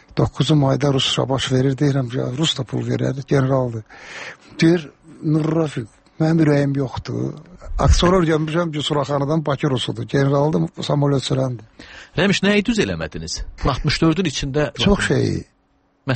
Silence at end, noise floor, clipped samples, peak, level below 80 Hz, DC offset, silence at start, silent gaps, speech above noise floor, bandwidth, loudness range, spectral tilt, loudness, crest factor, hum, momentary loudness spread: 0 s; -61 dBFS; under 0.1%; -4 dBFS; -32 dBFS; under 0.1%; 0.15 s; none; 43 dB; 8.8 kHz; 2 LU; -6 dB/octave; -19 LUFS; 16 dB; none; 13 LU